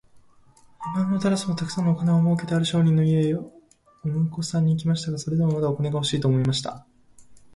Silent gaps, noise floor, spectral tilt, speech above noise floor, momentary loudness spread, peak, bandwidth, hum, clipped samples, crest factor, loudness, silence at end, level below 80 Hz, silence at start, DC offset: none; -54 dBFS; -6.5 dB/octave; 32 dB; 9 LU; -10 dBFS; 11.5 kHz; none; under 0.1%; 14 dB; -23 LUFS; 0.2 s; -56 dBFS; 0.8 s; under 0.1%